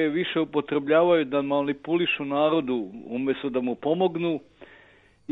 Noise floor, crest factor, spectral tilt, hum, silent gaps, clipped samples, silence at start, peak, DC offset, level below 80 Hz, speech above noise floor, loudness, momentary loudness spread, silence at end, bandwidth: -56 dBFS; 16 dB; -8.5 dB/octave; none; none; under 0.1%; 0 s; -8 dBFS; under 0.1%; -66 dBFS; 32 dB; -25 LUFS; 9 LU; 0 s; 4.1 kHz